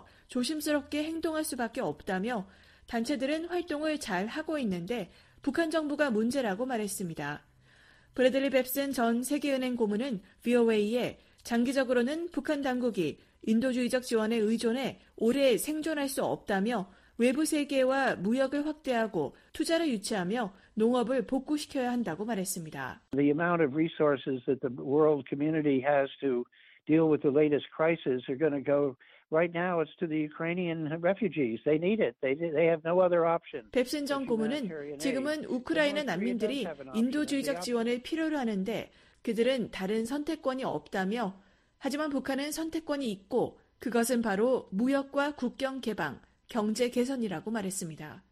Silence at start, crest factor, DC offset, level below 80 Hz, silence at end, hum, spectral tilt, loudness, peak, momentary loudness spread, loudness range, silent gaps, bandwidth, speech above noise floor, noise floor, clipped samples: 0.3 s; 18 dB; under 0.1%; -64 dBFS; 0.15 s; none; -5 dB/octave; -31 LUFS; -12 dBFS; 9 LU; 4 LU; none; 15 kHz; 31 dB; -60 dBFS; under 0.1%